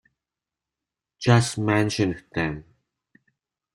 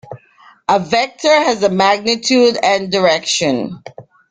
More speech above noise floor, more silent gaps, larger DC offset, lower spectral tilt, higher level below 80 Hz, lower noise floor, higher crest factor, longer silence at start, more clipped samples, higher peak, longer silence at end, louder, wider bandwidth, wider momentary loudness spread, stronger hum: first, 66 dB vs 33 dB; neither; neither; first, -5.5 dB/octave vs -3.5 dB/octave; about the same, -54 dBFS vs -56 dBFS; first, -88 dBFS vs -47 dBFS; first, 24 dB vs 14 dB; first, 1.2 s vs 0.1 s; neither; about the same, -2 dBFS vs 0 dBFS; first, 1.15 s vs 0.3 s; second, -23 LUFS vs -14 LUFS; first, 12 kHz vs 9.6 kHz; about the same, 9 LU vs 8 LU; neither